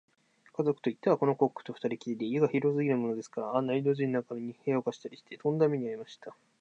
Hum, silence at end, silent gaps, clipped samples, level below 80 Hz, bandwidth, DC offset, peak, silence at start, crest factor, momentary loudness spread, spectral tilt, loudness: none; 0.3 s; none; under 0.1%; -82 dBFS; 8 kHz; under 0.1%; -12 dBFS; 0.6 s; 18 dB; 15 LU; -8 dB/octave; -31 LUFS